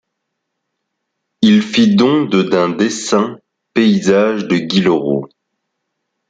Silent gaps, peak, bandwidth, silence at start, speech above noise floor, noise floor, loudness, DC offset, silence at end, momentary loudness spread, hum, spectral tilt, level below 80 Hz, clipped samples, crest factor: none; -2 dBFS; 9.2 kHz; 1.4 s; 61 dB; -74 dBFS; -14 LUFS; under 0.1%; 1.05 s; 6 LU; none; -5.5 dB/octave; -56 dBFS; under 0.1%; 14 dB